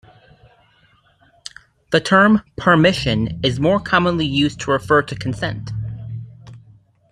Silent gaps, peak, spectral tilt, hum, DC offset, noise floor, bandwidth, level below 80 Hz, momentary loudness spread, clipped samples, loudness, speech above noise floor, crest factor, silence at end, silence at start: none; -2 dBFS; -6 dB/octave; none; under 0.1%; -56 dBFS; 11.5 kHz; -44 dBFS; 20 LU; under 0.1%; -17 LUFS; 39 dB; 18 dB; 0.5 s; 1.9 s